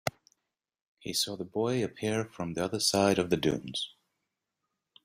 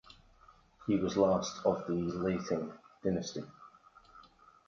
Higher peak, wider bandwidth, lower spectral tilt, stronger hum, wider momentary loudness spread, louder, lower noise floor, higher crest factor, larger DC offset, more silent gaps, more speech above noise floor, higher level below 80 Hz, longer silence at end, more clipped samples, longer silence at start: first, -10 dBFS vs -14 dBFS; first, 16 kHz vs 7.4 kHz; second, -4 dB/octave vs -6 dB/octave; neither; second, 10 LU vs 15 LU; first, -30 LUFS vs -34 LUFS; first, -86 dBFS vs -62 dBFS; about the same, 22 dB vs 20 dB; neither; first, 0.87-0.97 s vs none; first, 55 dB vs 30 dB; about the same, -64 dBFS vs -62 dBFS; first, 1.15 s vs 0.45 s; neither; second, 0.05 s vs 0.8 s